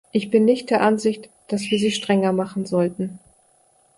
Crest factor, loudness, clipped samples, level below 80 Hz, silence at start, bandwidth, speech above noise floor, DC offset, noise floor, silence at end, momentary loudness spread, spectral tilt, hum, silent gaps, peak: 16 dB; -21 LUFS; under 0.1%; -64 dBFS; 0.15 s; 11.5 kHz; 39 dB; under 0.1%; -59 dBFS; 0.8 s; 11 LU; -5.5 dB/octave; none; none; -4 dBFS